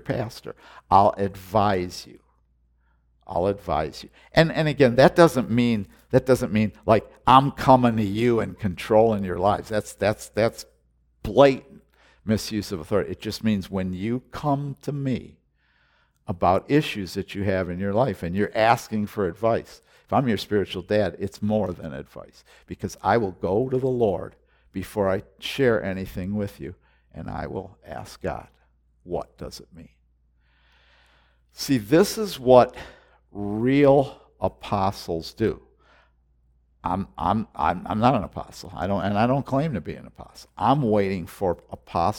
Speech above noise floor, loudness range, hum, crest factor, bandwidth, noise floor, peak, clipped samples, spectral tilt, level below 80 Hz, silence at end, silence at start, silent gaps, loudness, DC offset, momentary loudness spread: 42 dB; 9 LU; none; 24 dB; 18 kHz; -65 dBFS; 0 dBFS; under 0.1%; -6.5 dB/octave; -50 dBFS; 0 s; 0.05 s; none; -23 LUFS; under 0.1%; 18 LU